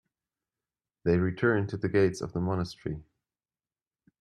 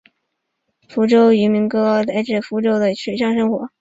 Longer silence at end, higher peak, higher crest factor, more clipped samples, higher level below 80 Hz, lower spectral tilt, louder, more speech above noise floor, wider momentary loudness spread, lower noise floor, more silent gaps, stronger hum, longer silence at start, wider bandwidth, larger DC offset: first, 1.2 s vs 0.15 s; second, -12 dBFS vs -4 dBFS; about the same, 18 dB vs 14 dB; neither; about the same, -58 dBFS vs -60 dBFS; about the same, -7.5 dB/octave vs -7 dB/octave; second, -29 LUFS vs -17 LUFS; first, over 62 dB vs 58 dB; first, 12 LU vs 8 LU; first, under -90 dBFS vs -74 dBFS; neither; neither; first, 1.05 s vs 0.9 s; first, 11.5 kHz vs 7.8 kHz; neither